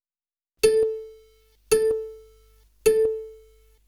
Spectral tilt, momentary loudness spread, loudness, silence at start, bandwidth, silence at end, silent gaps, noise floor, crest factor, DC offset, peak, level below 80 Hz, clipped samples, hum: -2.5 dB/octave; 19 LU; -23 LUFS; 0.65 s; 19.5 kHz; 0.55 s; none; under -90 dBFS; 20 dB; under 0.1%; -6 dBFS; -54 dBFS; under 0.1%; 50 Hz at -60 dBFS